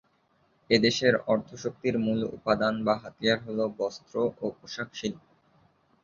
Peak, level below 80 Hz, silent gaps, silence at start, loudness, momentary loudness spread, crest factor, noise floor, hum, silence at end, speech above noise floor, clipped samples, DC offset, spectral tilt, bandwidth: -8 dBFS; -62 dBFS; none; 0.7 s; -28 LUFS; 13 LU; 22 dB; -68 dBFS; none; 0.85 s; 40 dB; under 0.1%; under 0.1%; -5 dB/octave; 7.4 kHz